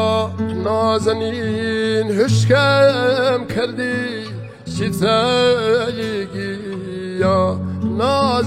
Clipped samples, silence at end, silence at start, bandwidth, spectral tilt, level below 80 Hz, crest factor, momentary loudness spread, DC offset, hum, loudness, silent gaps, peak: under 0.1%; 0 s; 0 s; 15 kHz; -5.5 dB/octave; -48 dBFS; 14 dB; 12 LU; under 0.1%; none; -18 LUFS; none; -4 dBFS